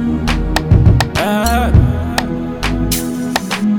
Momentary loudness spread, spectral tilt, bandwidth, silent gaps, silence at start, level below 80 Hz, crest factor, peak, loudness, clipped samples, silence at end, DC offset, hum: 7 LU; -5.5 dB/octave; over 20 kHz; none; 0 s; -20 dBFS; 14 dB; 0 dBFS; -15 LUFS; 0.5%; 0 s; under 0.1%; none